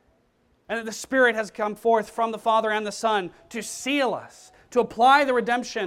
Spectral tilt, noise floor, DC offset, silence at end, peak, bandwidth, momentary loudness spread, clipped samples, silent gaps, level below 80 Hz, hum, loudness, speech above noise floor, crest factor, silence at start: -3 dB/octave; -65 dBFS; under 0.1%; 0 s; -6 dBFS; 16 kHz; 13 LU; under 0.1%; none; -64 dBFS; none; -23 LUFS; 42 dB; 18 dB; 0.7 s